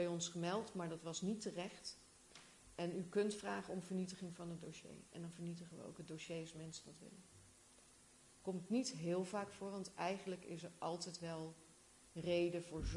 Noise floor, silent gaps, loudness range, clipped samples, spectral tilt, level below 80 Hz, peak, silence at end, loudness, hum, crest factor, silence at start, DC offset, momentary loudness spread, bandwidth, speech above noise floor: -67 dBFS; none; 8 LU; under 0.1%; -5 dB/octave; -64 dBFS; -28 dBFS; 0 s; -46 LUFS; none; 18 dB; 0 s; under 0.1%; 21 LU; 11.5 kHz; 22 dB